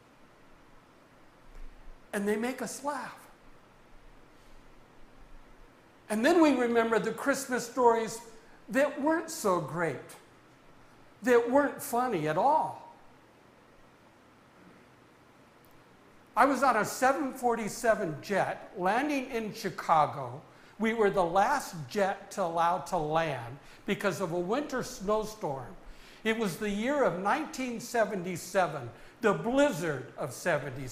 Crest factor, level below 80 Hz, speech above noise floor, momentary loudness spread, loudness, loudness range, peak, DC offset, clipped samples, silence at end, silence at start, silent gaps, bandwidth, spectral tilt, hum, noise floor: 22 dB; -58 dBFS; 29 dB; 11 LU; -30 LUFS; 9 LU; -8 dBFS; under 0.1%; under 0.1%; 0 s; 1.45 s; none; 16 kHz; -5 dB/octave; none; -59 dBFS